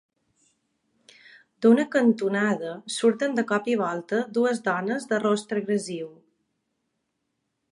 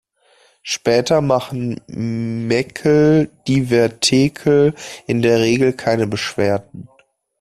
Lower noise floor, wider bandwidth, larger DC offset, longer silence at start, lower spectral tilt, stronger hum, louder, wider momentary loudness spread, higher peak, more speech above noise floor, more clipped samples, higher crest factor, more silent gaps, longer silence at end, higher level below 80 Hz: first, -78 dBFS vs -55 dBFS; second, 11 kHz vs 13.5 kHz; neither; first, 1.6 s vs 0.65 s; about the same, -5 dB/octave vs -5.5 dB/octave; neither; second, -24 LUFS vs -17 LUFS; about the same, 9 LU vs 10 LU; second, -8 dBFS vs -2 dBFS; first, 54 dB vs 39 dB; neither; about the same, 20 dB vs 16 dB; neither; first, 1.6 s vs 0.55 s; second, -76 dBFS vs -50 dBFS